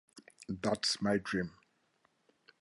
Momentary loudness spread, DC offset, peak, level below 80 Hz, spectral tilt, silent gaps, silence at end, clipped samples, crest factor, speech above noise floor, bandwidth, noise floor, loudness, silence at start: 13 LU; under 0.1%; -18 dBFS; -66 dBFS; -4 dB/octave; none; 1.1 s; under 0.1%; 20 dB; 41 dB; 11.5 kHz; -75 dBFS; -35 LUFS; 0.15 s